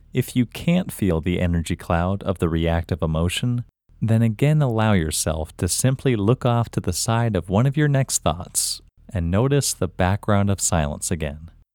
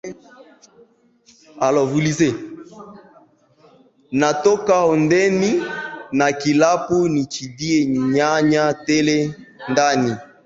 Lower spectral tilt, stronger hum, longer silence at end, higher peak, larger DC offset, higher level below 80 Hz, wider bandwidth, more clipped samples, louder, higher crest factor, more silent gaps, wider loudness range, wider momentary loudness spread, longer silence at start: about the same, -5 dB/octave vs -5 dB/octave; neither; about the same, 0.25 s vs 0.2 s; about the same, -4 dBFS vs -2 dBFS; neither; first, -38 dBFS vs -56 dBFS; first, 19.5 kHz vs 8 kHz; neither; second, -22 LUFS vs -18 LUFS; about the same, 18 dB vs 18 dB; neither; second, 2 LU vs 6 LU; second, 6 LU vs 11 LU; about the same, 0.15 s vs 0.05 s